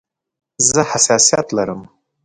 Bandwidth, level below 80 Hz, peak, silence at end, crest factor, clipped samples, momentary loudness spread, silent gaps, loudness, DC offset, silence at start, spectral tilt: 11 kHz; -52 dBFS; 0 dBFS; 0.4 s; 18 dB; under 0.1%; 12 LU; none; -14 LUFS; under 0.1%; 0.6 s; -2 dB/octave